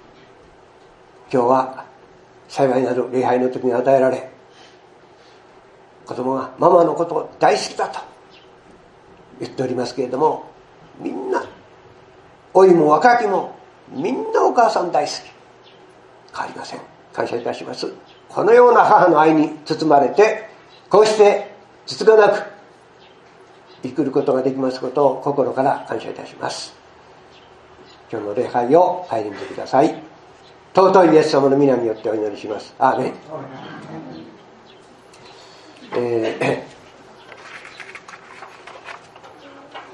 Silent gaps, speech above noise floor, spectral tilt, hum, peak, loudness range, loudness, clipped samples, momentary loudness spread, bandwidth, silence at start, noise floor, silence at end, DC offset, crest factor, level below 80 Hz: none; 31 dB; -5.5 dB/octave; none; 0 dBFS; 11 LU; -17 LUFS; under 0.1%; 23 LU; 11 kHz; 1.3 s; -48 dBFS; 0.1 s; under 0.1%; 20 dB; -66 dBFS